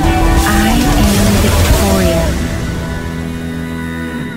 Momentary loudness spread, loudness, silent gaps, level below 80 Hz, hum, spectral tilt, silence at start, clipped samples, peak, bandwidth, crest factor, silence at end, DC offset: 10 LU; -13 LUFS; none; -18 dBFS; none; -5 dB/octave; 0 s; under 0.1%; 0 dBFS; 16.5 kHz; 12 dB; 0 s; 0.8%